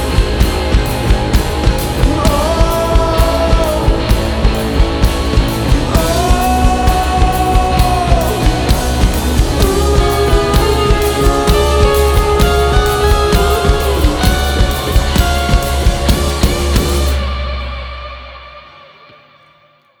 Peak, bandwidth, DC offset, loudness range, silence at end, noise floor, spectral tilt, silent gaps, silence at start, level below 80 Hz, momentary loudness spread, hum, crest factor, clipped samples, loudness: 0 dBFS; over 20 kHz; under 0.1%; 4 LU; 1.4 s; -50 dBFS; -5 dB/octave; none; 0 s; -14 dBFS; 3 LU; none; 12 dB; under 0.1%; -13 LUFS